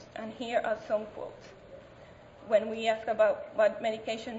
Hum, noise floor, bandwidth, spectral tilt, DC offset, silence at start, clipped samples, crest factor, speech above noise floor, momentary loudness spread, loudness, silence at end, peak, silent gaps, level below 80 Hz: none; -52 dBFS; 8 kHz; -4.5 dB/octave; under 0.1%; 0 s; under 0.1%; 18 dB; 22 dB; 23 LU; -30 LUFS; 0 s; -14 dBFS; none; -66 dBFS